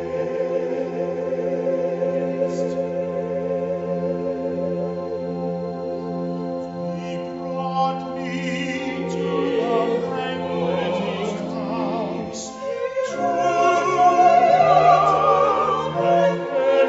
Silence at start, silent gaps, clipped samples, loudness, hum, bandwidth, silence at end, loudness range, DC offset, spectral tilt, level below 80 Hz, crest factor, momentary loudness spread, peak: 0 s; none; under 0.1%; -22 LUFS; none; 8 kHz; 0 s; 10 LU; under 0.1%; -6 dB/octave; -58 dBFS; 18 dB; 13 LU; -2 dBFS